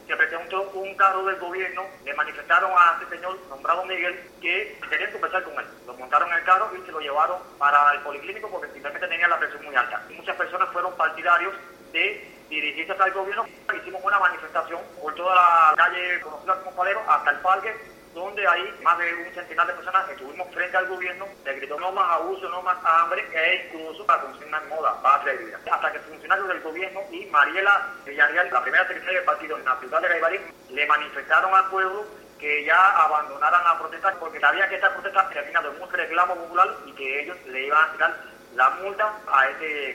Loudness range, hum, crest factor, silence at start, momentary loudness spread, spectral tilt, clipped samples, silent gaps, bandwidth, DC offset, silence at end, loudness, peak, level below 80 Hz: 4 LU; none; 20 dB; 0.1 s; 13 LU; -2.5 dB/octave; under 0.1%; none; 16 kHz; under 0.1%; 0 s; -23 LUFS; -4 dBFS; -66 dBFS